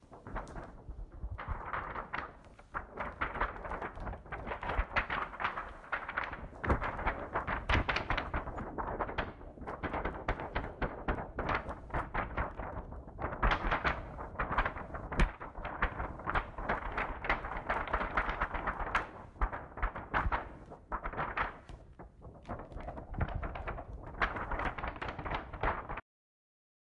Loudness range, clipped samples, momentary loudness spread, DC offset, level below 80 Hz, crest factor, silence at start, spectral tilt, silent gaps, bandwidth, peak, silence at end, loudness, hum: 5 LU; under 0.1%; 12 LU; under 0.1%; -44 dBFS; 20 dB; 0 s; -6.5 dB/octave; none; 10 kHz; -18 dBFS; 1 s; -38 LUFS; none